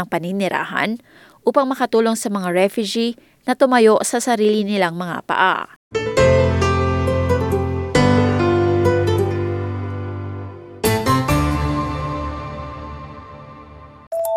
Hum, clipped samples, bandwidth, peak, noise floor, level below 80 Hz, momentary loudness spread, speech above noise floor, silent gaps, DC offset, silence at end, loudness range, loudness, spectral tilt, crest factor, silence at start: none; under 0.1%; 18 kHz; -2 dBFS; -40 dBFS; -38 dBFS; 15 LU; 22 dB; 5.76-5.91 s, 14.07-14.11 s; under 0.1%; 0 s; 5 LU; -18 LUFS; -5.5 dB/octave; 18 dB; 0 s